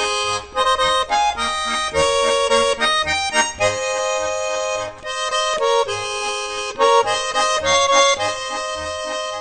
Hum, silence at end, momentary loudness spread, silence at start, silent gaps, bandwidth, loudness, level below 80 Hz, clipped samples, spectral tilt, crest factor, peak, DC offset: none; 0 s; 9 LU; 0 s; none; 9.4 kHz; -18 LUFS; -46 dBFS; under 0.1%; -0.5 dB/octave; 18 dB; -2 dBFS; under 0.1%